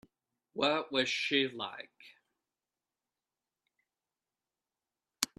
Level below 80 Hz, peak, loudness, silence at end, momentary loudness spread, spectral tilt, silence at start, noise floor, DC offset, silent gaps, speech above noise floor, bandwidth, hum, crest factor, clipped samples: -80 dBFS; -8 dBFS; -32 LUFS; 0.15 s; 17 LU; -2 dB/octave; 0.55 s; under -90 dBFS; under 0.1%; none; over 56 dB; 13 kHz; none; 32 dB; under 0.1%